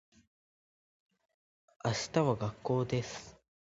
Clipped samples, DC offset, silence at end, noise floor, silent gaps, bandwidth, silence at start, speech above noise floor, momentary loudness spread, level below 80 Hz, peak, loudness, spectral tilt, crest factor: under 0.1%; under 0.1%; 0.4 s; under -90 dBFS; none; 7.6 kHz; 1.85 s; over 57 dB; 10 LU; -64 dBFS; -14 dBFS; -34 LUFS; -5.5 dB/octave; 22 dB